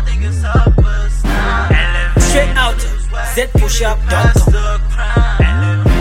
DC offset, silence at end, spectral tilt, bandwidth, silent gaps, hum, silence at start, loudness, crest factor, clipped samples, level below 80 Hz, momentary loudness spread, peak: under 0.1%; 0 s; -5 dB/octave; 15.5 kHz; none; none; 0 s; -14 LUFS; 12 dB; under 0.1%; -14 dBFS; 6 LU; 0 dBFS